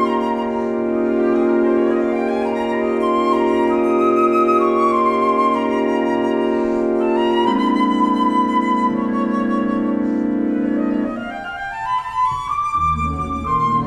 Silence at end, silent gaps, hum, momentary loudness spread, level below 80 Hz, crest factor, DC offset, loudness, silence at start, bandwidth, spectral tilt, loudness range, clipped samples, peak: 0 s; none; none; 5 LU; -42 dBFS; 12 dB; under 0.1%; -18 LUFS; 0 s; 9.6 kHz; -7 dB/octave; 4 LU; under 0.1%; -4 dBFS